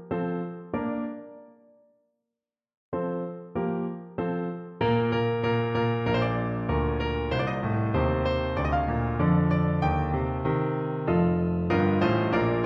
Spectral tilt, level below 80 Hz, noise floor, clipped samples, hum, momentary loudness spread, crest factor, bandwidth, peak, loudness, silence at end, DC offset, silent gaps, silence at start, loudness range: -9 dB/octave; -40 dBFS; -88 dBFS; under 0.1%; none; 9 LU; 16 dB; 6.4 kHz; -12 dBFS; -27 LUFS; 0 s; under 0.1%; 2.77-2.92 s; 0 s; 9 LU